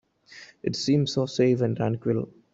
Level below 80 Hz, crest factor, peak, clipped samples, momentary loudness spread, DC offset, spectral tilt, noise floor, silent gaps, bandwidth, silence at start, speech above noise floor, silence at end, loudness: -62 dBFS; 16 dB; -10 dBFS; under 0.1%; 8 LU; under 0.1%; -6.5 dB/octave; -50 dBFS; none; 8 kHz; 0.3 s; 25 dB; 0.25 s; -25 LUFS